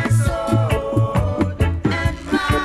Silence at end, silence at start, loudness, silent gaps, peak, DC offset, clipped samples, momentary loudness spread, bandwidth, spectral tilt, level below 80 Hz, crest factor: 0 s; 0 s; -20 LUFS; none; -6 dBFS; under 0.1%; under 0.1%; 3 LU; 13 kHz; -6.5 dB/octave; -28 dBFS; 12 dB